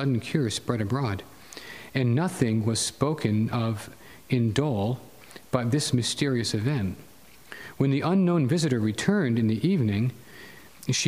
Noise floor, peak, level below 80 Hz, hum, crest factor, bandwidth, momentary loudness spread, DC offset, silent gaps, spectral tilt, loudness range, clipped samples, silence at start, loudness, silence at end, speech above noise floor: -47 dBFS; -8 dBFS; -60 dBFS; none; 18 dB; 15.5 kHz; 18 LU; 0.1%; none; -5.5 dB/octave; 2 LU; under 0.1%; 0 s; -26 LUFS; 0 s; 23 dB